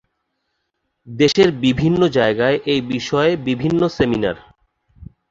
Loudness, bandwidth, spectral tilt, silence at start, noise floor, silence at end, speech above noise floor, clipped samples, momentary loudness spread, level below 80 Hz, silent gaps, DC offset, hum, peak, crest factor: -17 LUFS; 7.8 kHz; -6 dB/octave; 1.05 s; -73 dBFS; 0.25 s; 56 dB; under 0.1%; 7 LU; -46 dBFS; none; under 0.1%; none; -2 dBFS; 16 dB